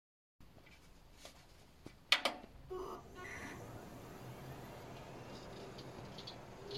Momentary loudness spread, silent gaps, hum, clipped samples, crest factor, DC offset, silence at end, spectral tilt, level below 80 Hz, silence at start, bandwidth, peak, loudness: 27 LU; none; none; under 0.1%; 34 dB; under 0.1%; 0 s; -3 dB/octave; -64 dBFS; 0.4 s; 16.5 kHz; -12 dBFS; -43 LUFS